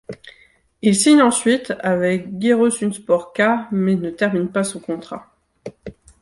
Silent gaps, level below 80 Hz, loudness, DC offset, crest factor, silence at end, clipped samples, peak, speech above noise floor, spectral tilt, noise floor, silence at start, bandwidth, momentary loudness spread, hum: none; -56 dBFS; -18 LUFS; under 0.1%; 18 dB; 0.3 s; under 0.1%; -2 dBFS; 37 dB; -4.5 dB/octave; -54 dBFS; 0.1 s; 11.5 kHz; 23 LU; none